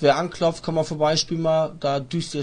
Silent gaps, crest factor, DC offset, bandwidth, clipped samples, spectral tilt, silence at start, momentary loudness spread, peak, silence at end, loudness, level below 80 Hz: none; 16 dB; under 0.1%; 10.5 kHz; under 0.1%; -5 dB/octave; 0 s; 5 LU; -6 dBFS; 0 s; -23 LUFS; -54 dBFS